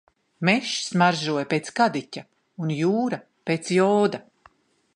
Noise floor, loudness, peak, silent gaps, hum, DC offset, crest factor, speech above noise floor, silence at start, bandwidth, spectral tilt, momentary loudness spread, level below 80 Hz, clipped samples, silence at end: -58 dBFS; -23 LUFS; -4 dBFS; none; none; under 0.1%; 20 dB; 35 dB; 0.4 s; 10.5 kHz; -5 dB/octave; 12 LU; -72 dBFS; under 0.1%; 0.75 s